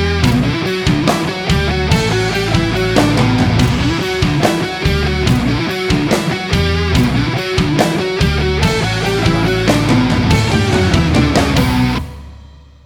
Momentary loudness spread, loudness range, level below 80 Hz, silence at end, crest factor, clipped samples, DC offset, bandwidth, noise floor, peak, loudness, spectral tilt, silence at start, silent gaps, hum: 4 LU; 2 LU; -24 dBFS; 0.4 s; 14 dB; under 0.1%; under 0.1%; 19.5 kHz; -38 dBFS; 0 dBFS; -14 LUFS; -5.5 dB/octave; 0 s; none; none